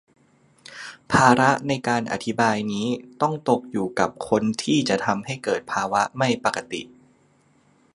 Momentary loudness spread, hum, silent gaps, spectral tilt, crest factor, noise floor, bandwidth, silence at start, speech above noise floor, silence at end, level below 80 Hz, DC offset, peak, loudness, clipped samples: 11 LU; none; none; -5 dB/octave; 24 dB; -60 dBFS; 11.5 kHz; 0.7 s; 38 dB; 1.1 s; -58 dBFS; under 0.1%; 0 dBFS; -22 LUFS; under 0.1%